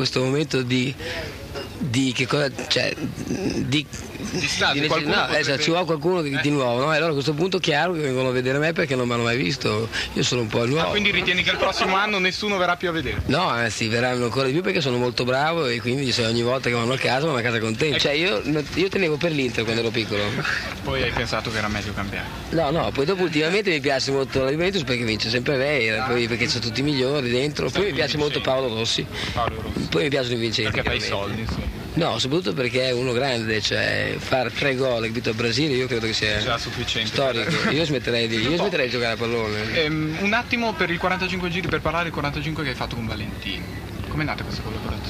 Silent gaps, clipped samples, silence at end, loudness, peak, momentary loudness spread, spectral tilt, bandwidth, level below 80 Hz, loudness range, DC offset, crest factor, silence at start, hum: none; under 0.1%; 0 s; -22 LUFS; -6 dBFS; 6 LU; -4.5 dB/octave; 15.5 kHz; -42 dBFS; 3 LU; under 0.1%; 16 dB; 0 s; none